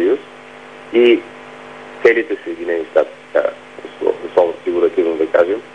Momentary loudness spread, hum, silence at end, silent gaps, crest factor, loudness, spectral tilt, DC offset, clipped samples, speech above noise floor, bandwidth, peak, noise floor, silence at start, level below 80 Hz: 21 LU; none; 0.05 s; none; 16 dB; -17 LUFS; -5.5 dB/octave; 0.2%; under 0.1%; 22 dB; 8.4 kHz; 0 dBFS; -37 dBFS; 0 s; -62 dBFS